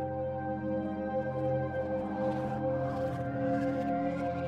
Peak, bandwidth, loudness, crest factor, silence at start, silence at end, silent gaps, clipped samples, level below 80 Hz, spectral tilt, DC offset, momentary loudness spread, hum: -20 dBFS; 8.2 kHz; -33 LUFS; 14 dB; 0 s; 0 s; none; under 0.1%; -58 dBFS; -9 dB/octave; under 0.1%; 3 LU; none